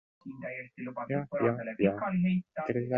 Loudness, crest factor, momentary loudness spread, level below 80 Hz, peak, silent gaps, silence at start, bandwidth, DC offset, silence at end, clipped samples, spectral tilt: -32 LUFS; 20 dB; 11 LU; -66 dBFS; -12 dBFS; none; 0.25 s; 4 kHz; under 0.1%; 0 s; under 0.1%; -10.5 dB/octave